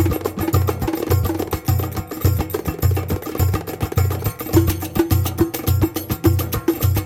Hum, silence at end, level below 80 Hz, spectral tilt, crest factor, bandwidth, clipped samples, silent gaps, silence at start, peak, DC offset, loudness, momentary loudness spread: none; 0 s; -32 dBFS; -6.5 dB/octave; 16 dB; 17 kHz; under 0.1%; none; 0 s; -2 dBFS; under 0.1%; -20 LUFS; 5 LU